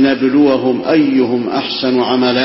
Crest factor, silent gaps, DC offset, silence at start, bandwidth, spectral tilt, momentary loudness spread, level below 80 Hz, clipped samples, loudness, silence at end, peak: 12 dB; none; under 0.1%; 0 s; 5.8 kHz; -9 dB/octave; 5 LU; -52 dBFS; under 0.1%; -13 LUFS; 0 s; 0 dBFS